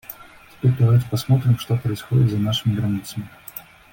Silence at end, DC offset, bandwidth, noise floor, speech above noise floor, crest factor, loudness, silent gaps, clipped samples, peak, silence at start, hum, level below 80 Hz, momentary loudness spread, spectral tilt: 0.3 s; under 0.1%; 17 kHz; -43 dBFS; 24 dB; 14 dB; -20 LUFS; none; under 0.1%; -6 dBFS; 0.1 s; none; -50 dBFS; 19 LU; -7 dB/octave